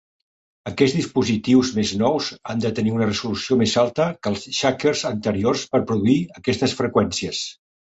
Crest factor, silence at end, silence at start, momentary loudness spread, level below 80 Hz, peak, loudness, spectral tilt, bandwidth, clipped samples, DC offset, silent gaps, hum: 18 dB; 0.4 s; 0.65 s; 7 LU; -50 dBFS; -2 dBFS; -21 LUFS; -5 dB/octave; 8.2 kHz; under 0.1%; under 0.1%; none; none